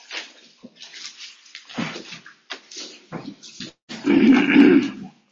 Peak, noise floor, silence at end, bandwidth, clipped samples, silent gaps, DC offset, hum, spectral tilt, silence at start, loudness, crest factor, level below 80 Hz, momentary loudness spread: -4 dBFS; -48 dBFS; 0.25 s; 7.4 kHz; under 0.1%; 3.82-3.88 s; under 0.1%; none; -5 dB/octave; 0.1 s; -17 LUFS; 18 dB; -62 dBFS; 25 LU